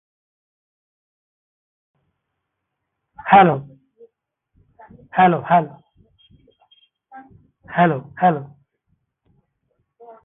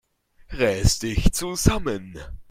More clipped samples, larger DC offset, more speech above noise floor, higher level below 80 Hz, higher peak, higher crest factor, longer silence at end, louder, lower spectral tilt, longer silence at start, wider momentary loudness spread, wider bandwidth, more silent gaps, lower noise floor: neither; neither; first, 63 dB vs 29 dB; second, -62 dBFS vs -30 dBFS; about the same, 0 dBFS vs 0 dBFS; about the same, 22 dB vs 22 dB; first, 1.8 s vs 0.1 s; first, -17 LUFS vs -23 LUFS; first, -11 dB/octave vs -4.5 dB/octave; first, 3.25 s vs 0.5 s; second, 16 LU vs 19 LU; second, 3.9 kHz vs 16.5 kHz; neither; first, -78 dBFS vs -51 dBFS